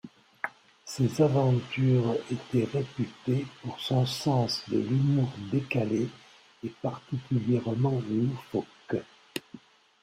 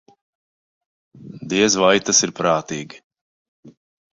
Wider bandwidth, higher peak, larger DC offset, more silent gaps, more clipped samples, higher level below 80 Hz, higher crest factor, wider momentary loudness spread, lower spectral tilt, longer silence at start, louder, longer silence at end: first, 15 kHz vs 7.8 kHz; second, -12 dBFS vs -2 dBFS; neither; second, none vs 3.04-3.10 s, 3.21-3.63 s; neither; about the same, -64 dBFS vs -60 dBFS; about the same, 18 dB vs 20 dB; second, 13 LU vs 18 LU; first, -7 dB/octave vs -2.5 dB/octave; second, 0.05 s vs 1.2 s; second, -29 LUFS vs -17 LUFS; about the same, 0.45 s vs 0.45 s